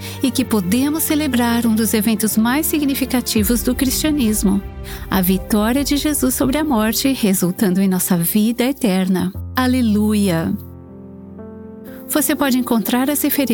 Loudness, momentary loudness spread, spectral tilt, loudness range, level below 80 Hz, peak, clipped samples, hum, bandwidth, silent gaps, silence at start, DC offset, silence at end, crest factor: -17 LUFS; 14 LU; -4.5 dB/octave; 3 LU; -36 dBFS; -4 dBFS; under 0.1%; none; 19.5 kHz; none; 0 s; under 0.1%; 0 s; 12 dB